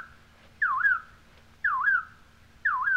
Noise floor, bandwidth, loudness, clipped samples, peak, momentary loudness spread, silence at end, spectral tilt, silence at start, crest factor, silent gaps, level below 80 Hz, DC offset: -55 dBFS; 8.8 kHz; -26 LUFS; under 0.1%; -14 dBFS; 10 LU; 0 s; -3 dB/octave; 0 s; 14 dB; none; -60 dBFS; under 0.1%